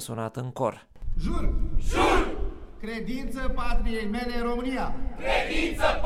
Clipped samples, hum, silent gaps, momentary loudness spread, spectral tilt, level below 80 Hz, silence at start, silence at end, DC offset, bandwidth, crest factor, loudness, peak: under 0.1%; none; none; 11 LU; -5 dB/octave; -30 dBFS; 0 s; 0 s; under 0.1%; 13.5 kHz; 16 dB; -29 LUFS; -8 dBFS